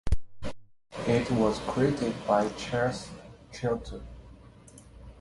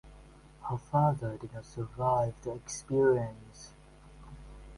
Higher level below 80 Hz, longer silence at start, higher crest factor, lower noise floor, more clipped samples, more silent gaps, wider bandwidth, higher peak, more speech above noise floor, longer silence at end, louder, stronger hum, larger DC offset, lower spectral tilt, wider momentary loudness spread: first, -42 dBFS vs -54 dBFS; about the same, 0.05 s vs 0.05 s; about the same, 20 dB vs 18 dB; about the same, -52 dBFS vs -54 dBFS; neither; neither; about the same, 11.5 kHz vs 11.5 kHz; first, -10 dBFS vs -14 dBFS; about the same, 24 dB vs 23 dB; about the same, 0 s vs 0 s; about the same, -29 LUFS vs -31 LUFS; neither; neither; about the same, -6 dB/octave vs -7 dB/octave; second, 19 LU vs 23 LU